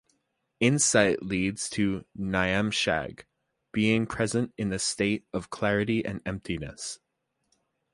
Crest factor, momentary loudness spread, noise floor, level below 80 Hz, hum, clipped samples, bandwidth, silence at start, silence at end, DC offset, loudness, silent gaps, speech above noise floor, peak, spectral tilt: 22 dB; 12 LU; -75 dBFS; -52 dBFS; none; under 0.1%; 11.5 kHz; 0.6 s; 1 s; under 0.1%; -27 LUFS; none; 48 dB; -6 dBFS; -4 dB/octave